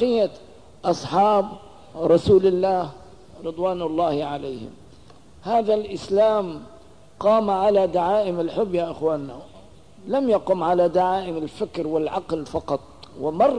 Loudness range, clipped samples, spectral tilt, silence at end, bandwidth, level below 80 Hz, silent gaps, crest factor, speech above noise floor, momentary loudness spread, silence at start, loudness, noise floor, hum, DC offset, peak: 3 LU; under 0.1%; -7 dB/octave; 0 s; 10.5 kHz; -52 dBFS; none; 16 dB; 28 dB; 15 LU; 0 s; -22 LUFS; -49 dBFS; none; 0.3%; -6 dBFS